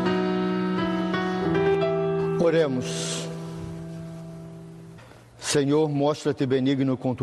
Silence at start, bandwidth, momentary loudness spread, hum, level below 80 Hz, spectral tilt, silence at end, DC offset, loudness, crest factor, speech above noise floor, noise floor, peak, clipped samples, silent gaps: 0 s; 12.5 kHz; 18 LU; none; -56 dBFS; -5.5 dB/octave; 0 s; under 0.1%; -24 LUFS; 14 dB; 24 dB; -47 dBFS; -10 dBFS; under 0.1%; none